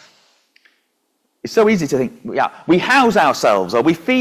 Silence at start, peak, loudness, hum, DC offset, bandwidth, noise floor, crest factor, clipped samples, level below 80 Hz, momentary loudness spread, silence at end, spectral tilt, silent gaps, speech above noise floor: 1.45 s; -2 dBFS; -15 LUFS; none; under 0.1%; 16 kHz; -68 dBFS; 14 dB; under 0.1%; -56 dBFS; 8 LU; 0 s; -5 dB/octave; none; 53 dB